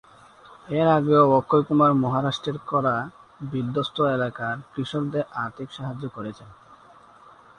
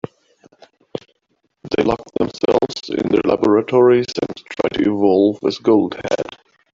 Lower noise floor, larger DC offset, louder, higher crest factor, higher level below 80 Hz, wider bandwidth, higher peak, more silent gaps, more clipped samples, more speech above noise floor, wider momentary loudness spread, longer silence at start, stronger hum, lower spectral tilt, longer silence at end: second, -51 dBFS vs -67 dBFS; neither; second, -23 LUFS vs -17 LUFS; about the same, 20 dB vs 16 dB; second, -60 dBFS vs -50 dBFS; first, 10 kHz vs 7.6 kHz; about the same, -4 dBFS vs -2 dBFS; neither; neither; second, 28 dB vs 52 dB; about the same, 15 LU vs 15 LU; second, 0.5 s vs 0.95 s; neither; about the same, -7.5 dB/octave vs -6.5 dB/octave; first, 0.85 s vs 0.45 s